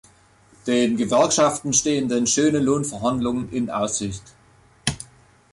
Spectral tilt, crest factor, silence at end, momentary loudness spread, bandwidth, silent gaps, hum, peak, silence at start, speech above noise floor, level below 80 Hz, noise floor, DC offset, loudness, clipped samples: -4 dB/octave; 18 dB; 0.5 s; 12 LU; 11.5 kHz; none; none; -4 dBFS; 0.65 s; 34 dB; -50 dBFS; -54 dBFS; under 0.1%; -21 LUFS; under 0.1%